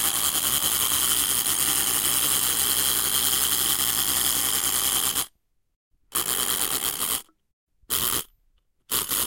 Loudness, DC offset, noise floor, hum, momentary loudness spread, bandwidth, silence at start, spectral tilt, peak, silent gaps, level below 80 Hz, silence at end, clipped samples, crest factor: -21 LUFS; under 0.1%; -66 dBFS; none; 7 LU; 17.5 kHz; 0 s; 0.5 dB/octave; -8 dBFS; 5.76-5.91 s, 7.53-7.67 s; -50 dBFS; 0 s; under 0.1%; 18 dB